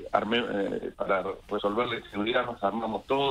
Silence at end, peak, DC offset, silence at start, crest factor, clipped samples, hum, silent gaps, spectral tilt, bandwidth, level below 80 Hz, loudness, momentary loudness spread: 0 s; -8 dBFS; under 0.1%; 0 s; 20 dB; under 0.1%; none; none; -6 dB/octave; 13 kHz; -56 dBFS; -29 LUFS; 6 LU